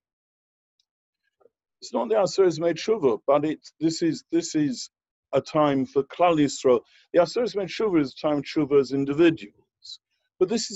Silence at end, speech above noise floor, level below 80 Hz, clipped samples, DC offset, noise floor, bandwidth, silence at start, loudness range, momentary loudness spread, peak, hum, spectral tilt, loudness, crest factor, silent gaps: 0 s; 41 dB; -64 dBFS; under 0.1%; under 0.1%; -64 dBFS; 8.2 kHz; 1.8 s; 2 LU; 10 LU; -8 dBFS; none; -5.5 dB/octave; -24 LUFS; 16 dB; 5.11-5.23 s